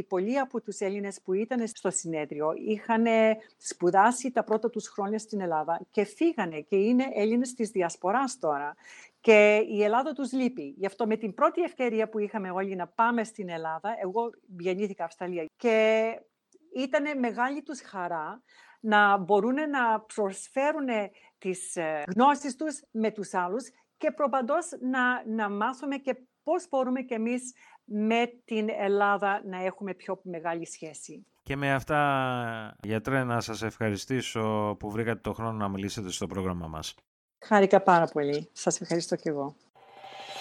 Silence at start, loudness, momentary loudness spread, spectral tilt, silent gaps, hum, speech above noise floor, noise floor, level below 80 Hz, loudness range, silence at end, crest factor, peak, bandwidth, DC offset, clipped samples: 0 s; -28 LUFS; 12 LU; -5 dB/octave; 37.07-37.29 s, 39.70-39.74 s; none; 19 dB; -47 dBFS; -64 dBFS; 5 LU; 0 s; 22 dB; -6 dBFS; 13.5 kHz; under 0.1%; under 0.1%